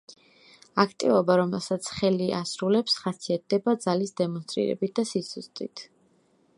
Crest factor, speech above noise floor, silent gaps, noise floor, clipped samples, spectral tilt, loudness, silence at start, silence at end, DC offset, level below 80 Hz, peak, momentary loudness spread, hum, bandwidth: 22 dB; 38 dB; none; -64 dBFS; under 0.1%; -5 dB/octave; -26 LUFS; 0.1 s; 0.75 s; under 0.1%; -66 dBFS; -4 dBFS; 12 LU; none; 11.5 kHz